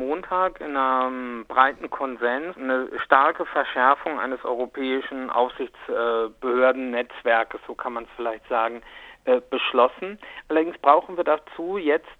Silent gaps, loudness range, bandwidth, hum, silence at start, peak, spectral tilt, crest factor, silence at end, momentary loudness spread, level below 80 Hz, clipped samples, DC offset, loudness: none; 3 LU; 4.7 kHz; none; 0 s; 0 dBFS; -5.5 dB/octave; 24 dB; 0.05 s; 11 LU; -60 dBFS; under 0.1%; under 0.1%; -23 LUFS